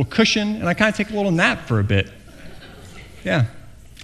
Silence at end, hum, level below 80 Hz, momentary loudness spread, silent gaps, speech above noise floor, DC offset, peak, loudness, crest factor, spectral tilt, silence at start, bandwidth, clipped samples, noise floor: 0 s; none; -46 dBFS; 23 LU; none; 20 dB; under 0.1%; 0 dBFS; -20 LUFS; 22 dB; -5.5 dB/octave; 0 s; 13 kHz; under 0.1%; -39 dBFS